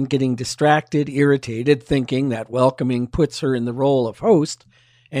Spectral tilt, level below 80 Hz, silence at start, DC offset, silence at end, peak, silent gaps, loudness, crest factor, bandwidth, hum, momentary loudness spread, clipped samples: -6.5 dB/octave; -44 dBFS; 0 s; under 0.1%; 0 s; -4 dBFS; none; -19 LUFS; 16 dB; 12 kHz; none; 5 LU; under 0.1%